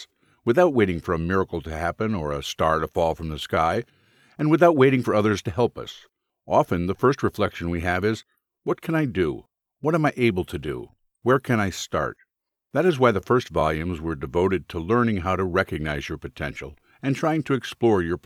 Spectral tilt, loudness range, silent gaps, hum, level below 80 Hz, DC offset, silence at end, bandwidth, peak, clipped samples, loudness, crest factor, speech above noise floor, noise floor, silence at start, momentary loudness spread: -6.5 dB/octave; 4 LU; none; none; -46 dBFS; under 0.1%; 0.05 s; 15 kHz; -4 dBFS; under 0.1%; -23 LUFS; 20 dB; 54 dB; -77 dBFS; 0 s; 12 LU